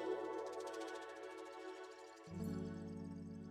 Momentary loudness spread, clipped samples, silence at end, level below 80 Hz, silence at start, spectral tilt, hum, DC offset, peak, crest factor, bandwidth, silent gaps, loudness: 8 LU; under 0.1%; 0 s; -74 dBFS; 0 s; -6 dB/octave; none; under 0.1%; -32 dBFS; 16 dB; 15 kHz; none; -49 LUFS